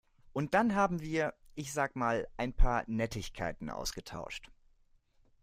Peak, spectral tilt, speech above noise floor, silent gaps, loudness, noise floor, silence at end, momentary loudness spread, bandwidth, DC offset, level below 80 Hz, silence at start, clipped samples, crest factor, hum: -12 dBFS; -5 dB/octave; 35 dB; none; -35 LUFS; -67 dBFS; 0.95 s; 13 LU; 15.5 kHz; under 0.1%; -40 dBFS; 0.35 s; under 0.1%; 20 dB; none